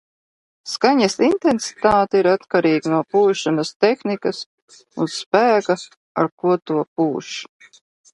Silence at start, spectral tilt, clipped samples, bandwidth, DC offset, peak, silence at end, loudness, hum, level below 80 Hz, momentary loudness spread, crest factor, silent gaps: 0.65 s; -5 dB/octave; under 0.1%; 11.5 kHz; under 0.1%; 0 dBFS; 0.7 s; -19 LUFS; none; -56 dBFS; 13 LU; 18 dB; 3.76-3.80 s, 4.46-4.68 s, 5.26-5.31 s, 5.97-6.15 s, 6.32-6.38 s, 6.87-6.96 s